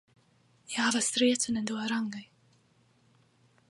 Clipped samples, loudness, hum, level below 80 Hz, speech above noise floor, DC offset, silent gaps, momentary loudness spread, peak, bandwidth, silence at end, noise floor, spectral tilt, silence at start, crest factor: under 0.1%; -29 LUFS; none; -74 dBFS; 37 dB; under 0.1%; none; 12 LU; -14 dBFS; 11.5 kHz; 1.45 s; -67 dBFS; -2 dB/octave; 0.7 s; 20 dB